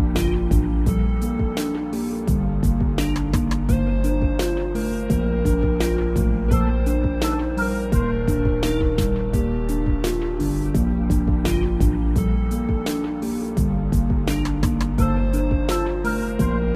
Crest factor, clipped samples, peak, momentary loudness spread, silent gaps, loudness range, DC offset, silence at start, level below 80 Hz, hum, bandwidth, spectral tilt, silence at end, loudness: 14 dB; under 0.1%; -4 dBFS; 4 LU; none; 1 LU; under 0.1%; 0 s; -22 dBFS; none; 15 kHz; -7 dB/octave; 0 s; -22 LUFS